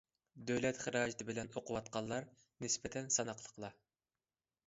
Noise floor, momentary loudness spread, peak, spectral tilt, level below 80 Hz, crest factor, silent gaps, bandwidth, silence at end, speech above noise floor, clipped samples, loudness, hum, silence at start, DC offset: under -90 dBFS; 13 LU; -20 dBFS; -4 dB/octave; -70 dBFS; 22 dB; none; 7.6 kHz; 0.95 s; over 49 dB; under 0.1%; -40 LUFS; none; 0.35 s; under 0.1%